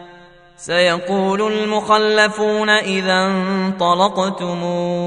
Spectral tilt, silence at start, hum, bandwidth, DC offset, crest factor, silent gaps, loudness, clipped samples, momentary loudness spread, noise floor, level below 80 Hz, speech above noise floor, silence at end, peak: -4.5 dB/octave; 0 s; none; 10.5 kHz; under 0.1%; 16 dB; none; -16 LUFS; under 0.1%; 6 LU; -44 dBFS; -58 dBFS; 27 dB; 0 s; 0 dBFS